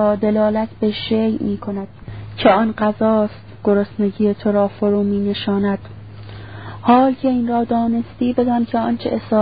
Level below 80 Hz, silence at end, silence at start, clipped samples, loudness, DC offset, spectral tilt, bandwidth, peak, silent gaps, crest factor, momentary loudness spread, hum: -46 dBFS; 0 s; 0 s; under 0.1%; -18 LUFS; 0.5%; -12 dB/octave; 5 kHz; 0 dBFS; none; 18 dB; 18 LU; none